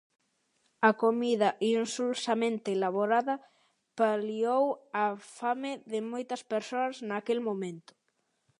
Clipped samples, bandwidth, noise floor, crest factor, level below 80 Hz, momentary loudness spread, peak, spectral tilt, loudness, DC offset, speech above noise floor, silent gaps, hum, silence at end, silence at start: under 0.1%; 11.5 kHz; -77 dBFS; 22 dB; -86 dBFS; 9 LU; -8 dBFS; -4.5 dB/octave; -30 LUFS; under 0.1%; 48 dB; none; none; 0.8 s; 0.8 s